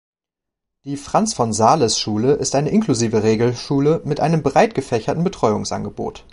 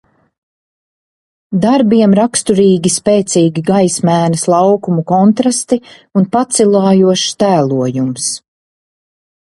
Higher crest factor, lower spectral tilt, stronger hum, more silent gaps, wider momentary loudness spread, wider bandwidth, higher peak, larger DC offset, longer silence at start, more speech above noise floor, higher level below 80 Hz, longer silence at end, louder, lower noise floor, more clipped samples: first, 18 dB vs 12 dB; about the same, -5 dB/octave vs -5.5 dB/octave; neither; neither; about the same, 9 LU vs 7 LU; about the same, 11.5 kHz vs 11.5 kHz; about the same, -2 dBFS vs 0 dBFS; neither; second, 0.85 s vs 1.5 s; second, 67 dB vs over 79 dB; about the same, -48 dBFS vs -52 dBFS; second, 0.15 s vs 1.15 s; second, -18 LUFS vs -12 LUFS; second, -85 dBFS vs under -90 dBFS; neither